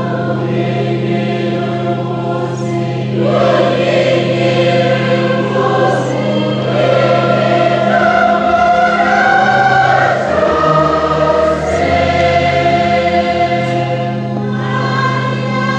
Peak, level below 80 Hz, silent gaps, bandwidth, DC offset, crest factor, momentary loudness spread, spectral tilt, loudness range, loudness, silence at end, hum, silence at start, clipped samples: 0 dBFS; -42 dBFS; none; 9 kHz; under 0.1%; 12 dB; 7 LU; -6.5 dB/octave; 4 LU; -13 LUFS; 0 s; none; 0 s; under 0.1%